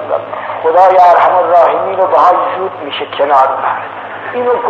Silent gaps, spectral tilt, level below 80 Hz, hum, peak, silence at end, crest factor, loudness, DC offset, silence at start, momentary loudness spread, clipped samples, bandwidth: none; -5 dB/octave; -60 dBFS; none; 0 dBFS; 0 s; 10 dB; -10 LUFS; under 0.1%; 0 s; 14 LU; 0.3%; 7 kHz